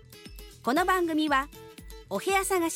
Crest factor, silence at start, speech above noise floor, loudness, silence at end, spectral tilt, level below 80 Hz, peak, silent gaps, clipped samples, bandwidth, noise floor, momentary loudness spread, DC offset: 16 dB; 0.1 s; 20 dB; -27 LUFS; 0 s; -3 dB/octave; -50 dBFS; -12 dBFS; none; under 0.1%; 16.5 kHz; -46 dBFS; 22 LU; under 0.1%